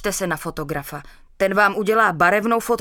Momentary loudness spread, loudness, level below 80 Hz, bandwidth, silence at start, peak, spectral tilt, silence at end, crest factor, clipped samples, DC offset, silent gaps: 13 LU; -19 LUFS; -46 dBFS; 18 kHz; 0 s; -4 dBFS; -4.5 dB/octave; 0 s; 18 dB; under 0.1%; under 0.1%; none